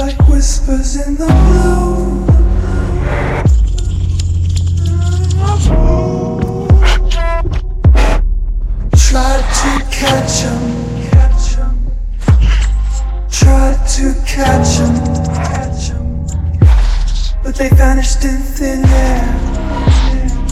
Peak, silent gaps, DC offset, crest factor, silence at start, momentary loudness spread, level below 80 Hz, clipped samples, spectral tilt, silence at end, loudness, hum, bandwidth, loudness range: 0 dBFS; none; under 0.1%; 10 dB; 0 s; 8 LU; -12 dBFS; 0.6%; -5.5 dB/octave; 0 s; -13 LUFS; none; 13.5 kHz; 1 LU